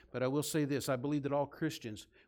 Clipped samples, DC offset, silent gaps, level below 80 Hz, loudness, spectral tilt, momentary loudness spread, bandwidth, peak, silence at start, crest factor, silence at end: under 0.1%; under 0.1%; none; -70 dBFS; -36 LUFS; -5.5 dB/octave; 6 LU; 17.5 kHz; -22 dBFS; 0.15 s; 14 dB; 0.25 s